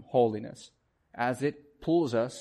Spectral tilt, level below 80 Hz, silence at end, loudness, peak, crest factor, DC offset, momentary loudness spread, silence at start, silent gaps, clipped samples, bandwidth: -6.5 dB/octave; -66 dBFS; 0 s; -30 LUFS; -12 dBFS; 18 dB; under 0.1%; 19 LU; 0 s; none; under 0.1%; 12 kHz